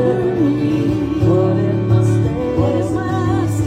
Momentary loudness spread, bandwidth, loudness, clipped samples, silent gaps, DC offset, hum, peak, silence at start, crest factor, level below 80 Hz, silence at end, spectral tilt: 4 LU; 10.5 kHz; -16 LUFS; under 0.1%; none; under 0.1%; none; -2 dBFS; 0 s; 12 dB; -36 dBFS; 0 s; -8.5 dB/octave